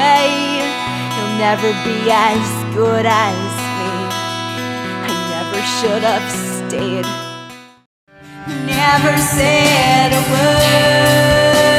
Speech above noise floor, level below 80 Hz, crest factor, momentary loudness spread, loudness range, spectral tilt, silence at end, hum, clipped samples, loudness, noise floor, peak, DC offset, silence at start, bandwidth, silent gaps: 22 dB; -40 dBFS; 14 dB; 11 LU; 7 LU; -4 dB/octave; 0 s; none; under 0.1%; -14 LUFS; -35 dBFS; 0 dBFS; under 0.1%; 0 s; 16.5 kHz; 7.86-8.07 s